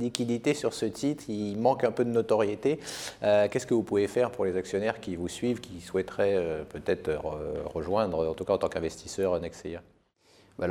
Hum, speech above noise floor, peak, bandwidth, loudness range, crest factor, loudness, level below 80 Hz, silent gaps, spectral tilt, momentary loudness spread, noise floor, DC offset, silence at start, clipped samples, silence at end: none; 34 dB; -6 dBFS; 15 kHz; 4 LU; 22 dB; -29 LUFS; -56 dBFS; none; -5.5 dB/octave; 9 LU; -62 dBFS; under 0.1%; 0 s; under 0.1%; 0 s